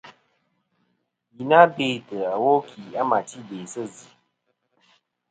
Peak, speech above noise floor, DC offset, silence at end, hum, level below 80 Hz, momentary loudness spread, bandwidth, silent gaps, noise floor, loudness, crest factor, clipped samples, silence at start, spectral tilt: 0 dBFS; 52 dB; under 0.1%; 1.4 s; none; -76 dBFS; 19 LU; 9.4 kHz; none; -74 dBFS; -21 LUFS; 24 dB; under 0.1%; 0.05 s; -5 dB/octave